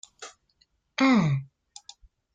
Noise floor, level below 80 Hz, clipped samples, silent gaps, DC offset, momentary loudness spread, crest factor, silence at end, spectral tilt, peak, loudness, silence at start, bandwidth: -69 dBFS; -62 dBFS; under 0.1%; none; under 0.1%; 25 LU; 18 dB; 0.9 s; -6 dB/octave; -10 dBFS; -24 LUFS; 0.2 s; 9.2 kHz